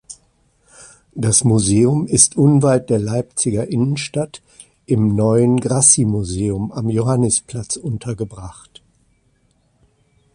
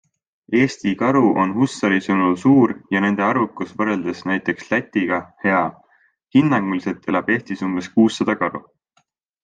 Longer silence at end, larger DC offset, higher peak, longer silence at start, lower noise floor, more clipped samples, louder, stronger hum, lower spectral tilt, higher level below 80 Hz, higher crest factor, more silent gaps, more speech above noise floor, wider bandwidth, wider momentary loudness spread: first, 1.85 s vs 0.85 s; neither; first, 0 dBFS vs -4 dBFS; second, 0.1 s vs 0.5 s; second, -60 dBFS vs -65 dBFS; neither; first, -16 LUFS vs -19 LUFS; neither; second, -5 dB/octave vs -6.5 dB/octave; first, -44 dBFS vs -62 dBFS; about the same, 18 dB vs 16 dB; neither; about the same, 44 dB vs 47 dB; first, 11.5 kHz vs 9.2 kHz; first, 14 LU vs 8 LU